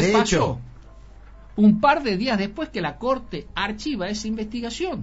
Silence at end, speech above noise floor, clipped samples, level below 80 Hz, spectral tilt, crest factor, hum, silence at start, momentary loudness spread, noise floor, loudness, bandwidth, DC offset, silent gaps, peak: 0 s; 22 dB; under 0.1%; -44 dBFS; -4.5 dB/octave; 20 dB; none; 0 s; 10 LU; -44 dBFS; -23 LUFS; 8 kHz; under 0.1%; none; -4 dBFS